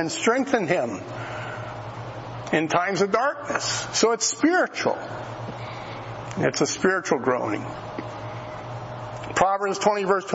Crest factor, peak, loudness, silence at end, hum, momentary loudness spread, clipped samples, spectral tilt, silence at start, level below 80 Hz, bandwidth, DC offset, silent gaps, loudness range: 20 dB; -6 dBFS; -25 LUFS; 0 s; none; 14 LU; under 0.1%; -3.5 dB/octave; 0 s; -56 dBFS; 8 kHz; under 0.1%; none; 3 LU